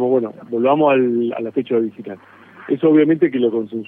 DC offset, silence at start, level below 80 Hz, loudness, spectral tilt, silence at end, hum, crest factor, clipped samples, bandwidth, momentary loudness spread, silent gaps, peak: under 0.1%; 0 s; -68 dBFS; -17 LUFS; -10 dB/octave; 0.05 s; none; 16 dB; under 0.1%; 3.8 kHz; 12 LU; none; -2 dBFS